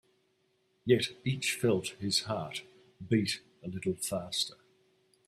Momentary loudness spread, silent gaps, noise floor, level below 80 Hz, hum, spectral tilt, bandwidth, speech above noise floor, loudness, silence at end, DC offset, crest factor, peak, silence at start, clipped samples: 12 LU; none; -74 dBFS; -68 dBFS; none; -4 dB/octave; 15.5 kHz; 42 dB; -32 LUFS; 0.75 s; under 0.1%; 22 dB; -12 dBFS; 0.85 s; under 0.1%